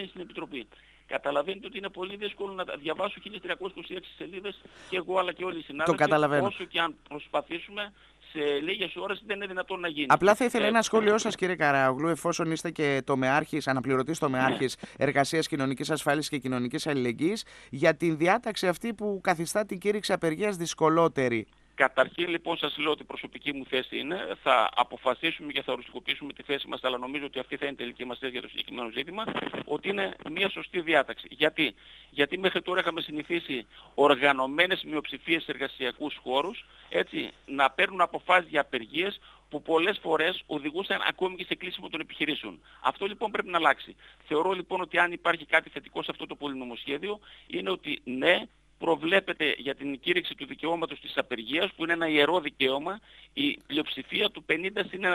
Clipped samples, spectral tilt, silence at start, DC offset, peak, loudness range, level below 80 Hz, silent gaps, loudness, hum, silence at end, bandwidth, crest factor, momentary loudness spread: under 0.1%; -4 dB/octave; 0 s; under 0.1%; -6 dBFS; 7 LU; -64 dBFS; none; -28 LUFS; none; 0 s; 13.5 kHz; 22 dB; 12 LU